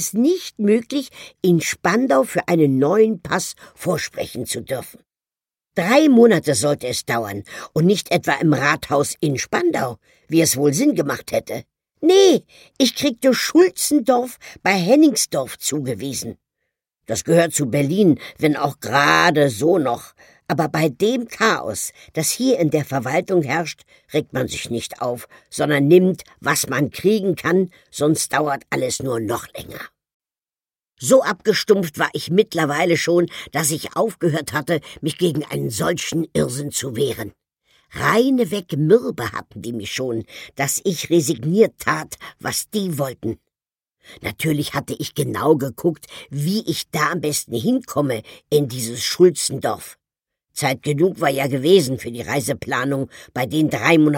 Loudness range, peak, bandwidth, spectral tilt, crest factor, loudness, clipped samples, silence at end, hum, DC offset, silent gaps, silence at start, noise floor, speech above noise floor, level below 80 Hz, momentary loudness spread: 5 LU; -2 dBFS; 17 kHz; -4.5 dB/octave; 18 dB; -19 LUFS; under 0.1%; 0 s; none; under 0.1%; 30.14-30.20 s; 0 s; under -90 dBFS; over 71 dB; -56 dBFS; 12 LU